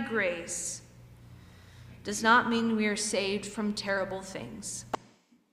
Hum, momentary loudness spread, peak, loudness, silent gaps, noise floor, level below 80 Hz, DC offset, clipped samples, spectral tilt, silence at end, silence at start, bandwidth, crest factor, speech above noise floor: none; 16 LU; -10 dBFS; -30 LUFS; none; -61 dBFS; -62 dBFS; under 0.1%; under 0.1%; -3 dB/octave; 0.55 s; 0 s; 15 kHz; 20 dB; 32 dB